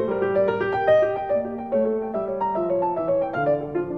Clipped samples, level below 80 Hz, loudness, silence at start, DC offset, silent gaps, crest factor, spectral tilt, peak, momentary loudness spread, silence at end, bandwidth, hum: under 0.1%; -56 dBFS; -23 LUFS; 0 s; 0.1%; none; 14 dB; -8.5 dB/octave; -8 dBFS; 6 LU; 0 s; 6 kHz; none